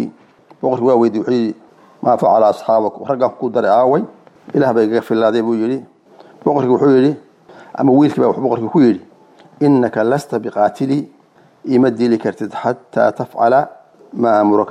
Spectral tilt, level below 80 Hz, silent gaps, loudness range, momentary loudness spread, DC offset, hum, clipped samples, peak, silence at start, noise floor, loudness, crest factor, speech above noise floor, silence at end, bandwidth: -8 dB/octave; -62 dBFS; none; 2 LU; 10 LU; under 0.1%; none; under 0.1%; -2 dBFS; 0 s; -49 dBFS; -15 LUFS; 12 dB; 36 dB; 0 s; 11.5 kHz